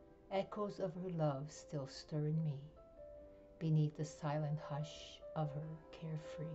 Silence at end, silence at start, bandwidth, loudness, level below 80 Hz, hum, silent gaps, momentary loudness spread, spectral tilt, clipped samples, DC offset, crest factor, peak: 0 s; 0 s; 8 kHz; -43 LUFS; -68 dBFS; none; none; 18 LU; -7.5 dB/octave; under 0.1%; under 0.1%; 14 dB; -28 dBFS